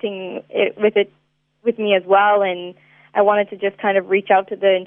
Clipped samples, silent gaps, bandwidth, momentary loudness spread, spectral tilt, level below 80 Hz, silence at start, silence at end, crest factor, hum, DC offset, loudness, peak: under 0.1%; none; 3.7 kHz; 12 LU; -8.5 dB/octave; -76 dBFS; 0.05 s; 0 s; 16 dB; none; under 0.1%; -18 LUFS; -2 dBFS